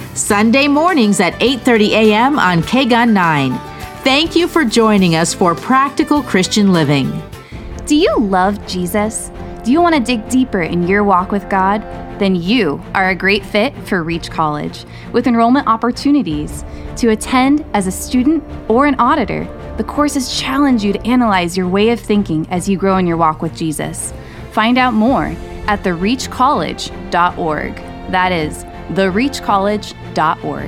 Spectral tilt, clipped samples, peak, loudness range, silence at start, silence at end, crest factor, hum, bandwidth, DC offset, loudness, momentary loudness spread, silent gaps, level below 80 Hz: -5 dB/octave; under 0.1%; 0 dBFS; 4 LU; 0 s; 0 s; 14 dB; none; 16 kHz; under 0.1%; -14 LUFS; 11 LU; none; -34 dBFS